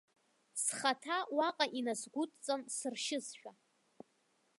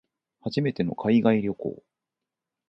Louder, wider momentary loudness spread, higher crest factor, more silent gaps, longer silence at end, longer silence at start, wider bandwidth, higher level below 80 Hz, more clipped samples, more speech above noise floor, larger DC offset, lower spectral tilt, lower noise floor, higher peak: second, -37 LUFS vs -25 LUFS; second, 11 LU vs 14 LU; about the same, 24 dB vs 20 dB; neither; first, 1.1 s vs 0.95 s; about the same, 0.55 s vs 0.45 s; first, 12 kHz vs 6.2 kHz; second, under -90 dBFS vs -62 dBFS; neither; second, 38 dB vs 63 dB; neither; second, -1 dB/octave vs -8.5 dB/octave; second, -76 dBFS vs -87 dBFS; second, -16 dBFS vs -8 dBFS